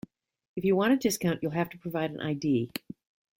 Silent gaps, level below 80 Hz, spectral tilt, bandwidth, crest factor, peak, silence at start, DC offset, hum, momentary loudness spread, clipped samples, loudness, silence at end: none; -66 dBFS; -5.5 dB/octave; 16.5 kHz; 16 dB; -14 dBFS; 0.55 s; under 0.1%; none; 16 LU; under 0.1%; -29 LUFS; 0.6 s